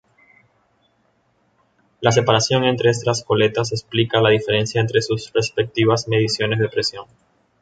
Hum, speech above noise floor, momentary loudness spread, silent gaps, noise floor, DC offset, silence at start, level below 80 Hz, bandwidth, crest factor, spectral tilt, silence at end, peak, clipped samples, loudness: none; 45 dB; 6 LU; none; -63 dBFS; under 0.1%; 2 s; -54 dBFS; 9.2 kHz; 18 dB; -4.5 dB/octave; 0.6 s; -2 dBFS; under 0.1%; -19 LUFS